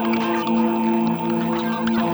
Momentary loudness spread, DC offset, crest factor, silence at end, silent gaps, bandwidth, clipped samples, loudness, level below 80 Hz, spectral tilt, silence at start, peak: 2 LU; under 0.1%; 12 dB; 0 s; none; over 20 kHz; under 0.1%; -21 LUFS; -58 dBFS; -7 dB/octave; 0 s; -10 dBFS